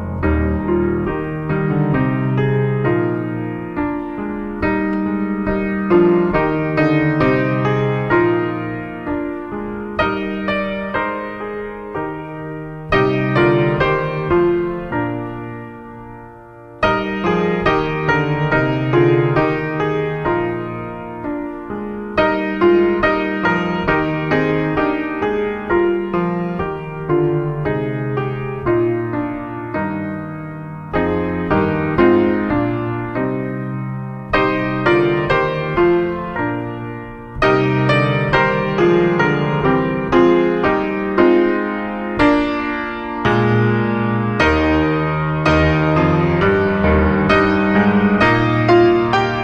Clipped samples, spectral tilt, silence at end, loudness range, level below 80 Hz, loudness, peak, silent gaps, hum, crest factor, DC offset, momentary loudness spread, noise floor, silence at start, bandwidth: under 0.1%; -8 dB/octave; 0 s; 6 LU; -34 dBFS; -17 LUFS; -2 dBFS; none; none; 16 dB; under 0.1%; 12 LU; -38 dBFS; 0 s; 7 kHz